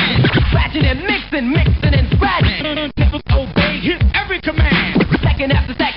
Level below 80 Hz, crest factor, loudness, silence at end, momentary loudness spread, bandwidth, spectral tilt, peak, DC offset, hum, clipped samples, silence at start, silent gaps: -20 dBFS; 10 dB; -15 LUFS; 0 s; 4 LU; 5.6 kHz; -10 dB/octave; -4 dBFS; under 0.1%; none; under 0.1%; 0 s; none